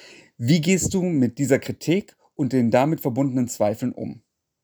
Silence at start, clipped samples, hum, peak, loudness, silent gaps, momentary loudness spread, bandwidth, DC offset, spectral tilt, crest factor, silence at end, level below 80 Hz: 0.05 s; under 0.1%; none; -4 dBFS; -22 LUFS; none; 10 LU; over 20 kHz; under 0.1%; -6 dB/octave; 18 dB; 0.45 s; -54 dBFS